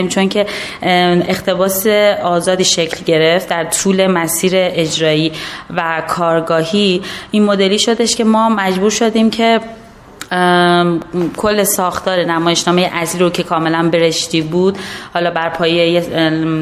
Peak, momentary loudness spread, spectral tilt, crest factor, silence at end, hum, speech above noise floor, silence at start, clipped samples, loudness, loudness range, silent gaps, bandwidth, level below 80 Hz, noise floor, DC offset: 0 dBFS; 6 LU; -4 dB/octave; 14 dB; 0 s; none; 20 dB; 0 s; under 0.1%; -13 LUFS; 2 LU; none; 15.5 kHz; -48 dBFS; -34 dBFS; under 0.1%